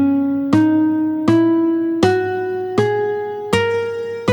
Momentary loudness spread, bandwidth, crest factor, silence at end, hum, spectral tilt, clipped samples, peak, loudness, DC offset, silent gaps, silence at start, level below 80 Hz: 7 LU; 11.5 kHz; 16 dB; 0 s; none; -7 dB/octave; under 0.1%; 0 dBFS; -17 LUFS; under 0.1%; none; 0 s; -52 dBFS